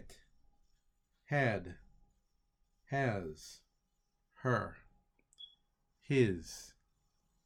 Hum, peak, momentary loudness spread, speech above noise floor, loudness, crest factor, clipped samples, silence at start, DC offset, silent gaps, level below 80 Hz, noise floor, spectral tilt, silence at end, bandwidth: none; -18 dBFS; 23 LU; 45 dB; -36 LUFS; 24 dB; under 0.1%; 0 s; under 0.1%; none; -66 dBFS; -80 dBFS; -6.5 dB/octave; 0.8 s; 16 kHz